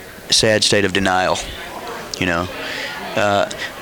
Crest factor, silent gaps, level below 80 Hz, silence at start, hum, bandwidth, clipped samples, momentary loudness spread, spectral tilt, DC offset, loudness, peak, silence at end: 18 dB; none; -44 dBFS; 0 s; none; over 20 kHz; under 0.1%; 14 LU; -3 dB/octave; under 0.1%; -17 LUFS; -2 dBFS; 0 s